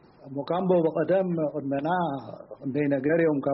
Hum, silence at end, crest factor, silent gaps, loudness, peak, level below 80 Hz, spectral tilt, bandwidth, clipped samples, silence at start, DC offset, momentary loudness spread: none; 0 s; 14 dB; none; -26 LUFS; -10 dBFS; -66 dBFS; -7 dB/octave; 5.8 kHz; under 0.1%; 0.25 s; under 0.1%; 14 LU